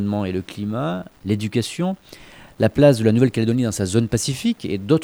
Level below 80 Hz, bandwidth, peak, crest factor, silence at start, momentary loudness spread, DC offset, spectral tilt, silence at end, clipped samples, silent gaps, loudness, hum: -48 dBFS; over 20 kHz; -2 dBFS; 18 dB; 0 s; 12 LU; under 0.1%; -6 dB/octave; 0 s; under 0.1%; none; -20 LUFS; none